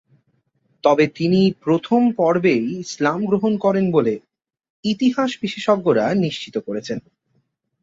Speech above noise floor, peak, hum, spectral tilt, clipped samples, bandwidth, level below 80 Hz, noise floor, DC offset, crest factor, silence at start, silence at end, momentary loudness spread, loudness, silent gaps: 49 dB; -2 dBFS; none; -6.5 dB/octave; under 0.1%; 7.8 kHz; -60 dBFS; -67 dBFS; under 0.1%; 18 dB; 0.85 s; 0.8 s; 10 LU; -19 LUFS; 4.70-4.83 s